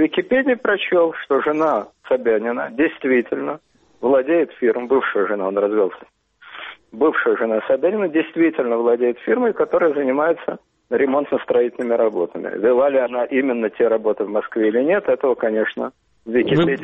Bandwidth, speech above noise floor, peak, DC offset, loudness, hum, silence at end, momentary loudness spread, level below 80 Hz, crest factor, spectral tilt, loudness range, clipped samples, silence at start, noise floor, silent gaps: 4 kHz; 21 dB; -6 dBFS; under 0.1%; -19 LUFS; none; 0 s; 8 LU; -62 dBFS; 14 dB; -8 dB/octave; 2 LU; under 0.1%; 0 s; -39 dBFS; none